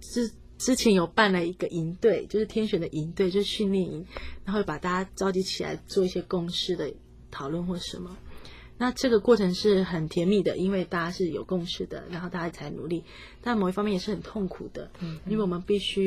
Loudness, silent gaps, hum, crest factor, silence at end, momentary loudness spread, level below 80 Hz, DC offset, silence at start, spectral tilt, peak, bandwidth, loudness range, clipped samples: -28 LUFS; none; none; 20 dB; 0 s; 15 LU; -50 dBFS; under 0.1%; 0 s; -5.5 dB/octave; -8 dBFS; 15 kHz; 6 LU; under 0.1%